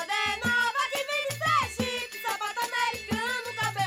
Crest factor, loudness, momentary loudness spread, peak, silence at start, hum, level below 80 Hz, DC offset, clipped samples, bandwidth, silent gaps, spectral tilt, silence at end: 16 dB; -28 LUFS; 5 LU; -14 dBFS; 0 s; none; -58 dBFS; under 0.1%; under 0.1%; 16.5 kHz; none; -2.5 dB/octave; 0 s